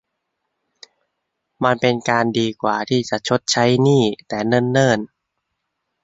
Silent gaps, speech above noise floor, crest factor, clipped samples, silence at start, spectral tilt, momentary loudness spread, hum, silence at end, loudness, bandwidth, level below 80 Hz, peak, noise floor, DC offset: none; 59 dB; 18 dB; under 0.1%; 1.6 s; -5 dB/octave; 7 LU; none; 1 s; -18 LUFS; 8 kHz; -58 dBFS; -2 dBFS; -76 dBFS; under 0.1%